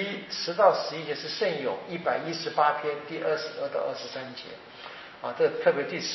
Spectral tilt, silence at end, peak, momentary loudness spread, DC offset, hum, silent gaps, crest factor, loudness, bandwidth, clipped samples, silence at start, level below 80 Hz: -2 dB/octave; 0 s; -6 dBFS; 17 LU; under 0.1%; none; none; 22 dB; -28 LUFS; 6.2 kHz; under 0.1%; 0 s; -76 dBFS